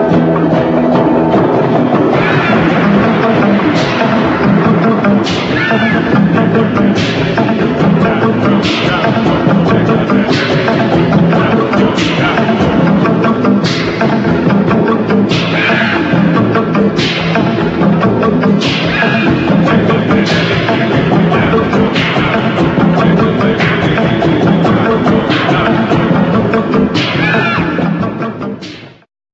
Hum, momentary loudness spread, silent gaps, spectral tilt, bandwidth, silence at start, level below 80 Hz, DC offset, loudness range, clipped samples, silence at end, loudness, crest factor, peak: none; 2 LU; none; -7 dB/octave; 7.8 kHz; 0 s; -36 dBFS; under 0.1%; 1 LU; under 0.1%; 0.45 s; -10 LUFS; 10 dB; 0 dBFS